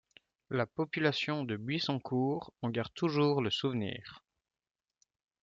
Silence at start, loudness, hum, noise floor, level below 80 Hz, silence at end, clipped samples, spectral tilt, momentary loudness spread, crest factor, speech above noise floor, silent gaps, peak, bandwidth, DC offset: 0.5 s; -34 LUFS; none; under -90 dBFS; -72 dBFS; 1.25 s; under 0.1%; -6.5 dB/octave; 8 LU; 20 dB; over 57 dB; none; -16 dBFS; 7.6 kHz; under 0.1%